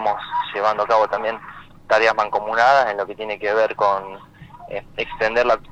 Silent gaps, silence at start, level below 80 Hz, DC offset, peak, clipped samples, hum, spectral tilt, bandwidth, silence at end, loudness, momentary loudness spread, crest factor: none; 0 s; -50 dBFS; under 0.1%; 0 dBFS; under 0.1%; none; -3.5 dB/octave; 8.8 kHz; 0.05 s; -19 LUFS; 16 LU; 20 dB